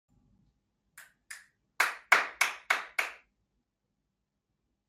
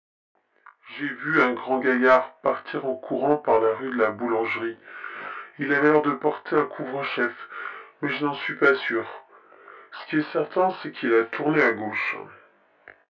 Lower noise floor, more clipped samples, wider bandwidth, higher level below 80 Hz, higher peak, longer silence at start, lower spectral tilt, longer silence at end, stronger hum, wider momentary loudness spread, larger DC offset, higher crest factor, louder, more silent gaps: first, -83 dBFS vs -55 dBFS; neither; first, 16 kHz vs 7 kHz; second, -80 dBFS vs -72 dBFS; about the same, -6 dBFS vs -6 dBFS; about the same, 0.95 s vs 0.85 s; second, 1.5 dB/octave vs -7 dB/octave; first, 1.75 s vs 0.8 s; neither; first, 24 LU vs 15 LU; neither; first, 30 dB vs 20 dB; second, -29 LUFS vs -24 LUFS; neither